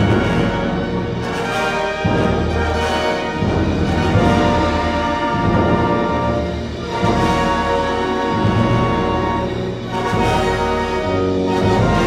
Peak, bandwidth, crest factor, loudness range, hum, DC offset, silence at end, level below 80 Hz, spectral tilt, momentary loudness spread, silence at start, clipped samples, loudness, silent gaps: -2 dBFS; 14 kHz; 14 dB; 2 LU; none; under 0.1%; 0 s; -32 dBFS; -6.5 dB/octave; 5 LU; 0 s; under 0.1%; -17 LUFS; none